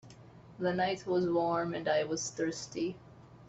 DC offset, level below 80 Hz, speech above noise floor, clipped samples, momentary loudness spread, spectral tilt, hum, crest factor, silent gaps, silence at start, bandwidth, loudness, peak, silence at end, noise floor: under 0.1%; -68 dBFS; 22 dB; under 0.1%; 7 LU; -4.5 dB/octave; none; 16 dB; none; 0.05 s; 8.2 kHz; -33 LUFS; -18 dBFS; 0 s; -54 dBFS